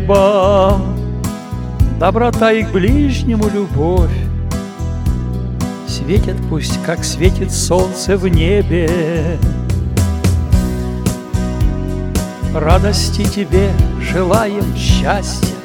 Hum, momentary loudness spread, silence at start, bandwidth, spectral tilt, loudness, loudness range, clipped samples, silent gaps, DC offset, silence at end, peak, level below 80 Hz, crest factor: none; 8 LU; 0 s; 18.5 kHz; -6 dB/octave; -15 LUFS; 3 LU; under 0.1%; none; under 0.1%; 0 s; 0 dBFS; -20 dBFS; 14 dB